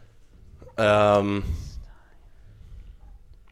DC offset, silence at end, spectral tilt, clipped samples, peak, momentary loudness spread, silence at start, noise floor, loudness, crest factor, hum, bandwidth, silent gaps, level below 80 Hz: under 0.1%; 0.6 s; -6.5 dB/octave; under 0.1%; -8 dBFS; 22 LU; 0.6 s; -50 dBFS; -22 LUFS; 20 dB; none; 11.5 kHz; none; -42 dBFS